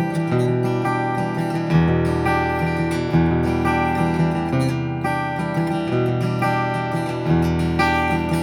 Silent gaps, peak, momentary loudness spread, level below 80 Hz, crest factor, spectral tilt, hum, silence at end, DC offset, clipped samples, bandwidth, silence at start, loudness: none; -4 dBFS; 4 LU; -38 dBFS; 14 dB; -7.5 dB/octave; none; 0 s; under 0.1%; under 0.1%; 12.5 kHz; 0 s; -20 LUFS